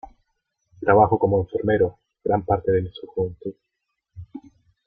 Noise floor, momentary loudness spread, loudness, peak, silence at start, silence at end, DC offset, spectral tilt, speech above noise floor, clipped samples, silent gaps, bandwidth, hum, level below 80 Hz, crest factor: -75 dBFS; 22 LU; -22 LUFS; -2 dBFS; 0.8 s; 0.45 s; under 0.1%; -10.5 dB/octave; 54 dB; under 0.1%; none; 4 kHz; none; -50 dBFS; 22 dB